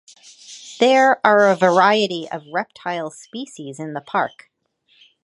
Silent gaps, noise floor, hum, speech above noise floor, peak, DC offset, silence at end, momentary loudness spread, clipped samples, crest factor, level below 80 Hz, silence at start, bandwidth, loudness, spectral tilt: none; -62 dBFS; none; 44 dB; 0 dBFS; under 0.1%; 0.95 s; 19 LU; under 0.1%; 20 dB; -72 dBFS; 0.5 s; 11.5 kHz; -17 LUFS; -4.5 dB/octave